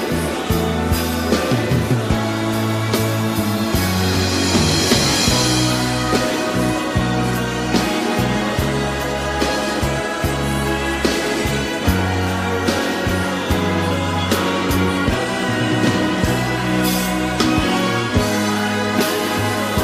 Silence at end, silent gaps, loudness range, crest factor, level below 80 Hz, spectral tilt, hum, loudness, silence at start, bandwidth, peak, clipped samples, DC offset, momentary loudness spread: 0 s; none; 3 LU; 14 dB; -32 dBFS; -4.5 dB/octave; none; -18 LUFS; 0 s; 15.5 kHz; -4 dBFS; under 0.1%; under 0.1%; 4 LU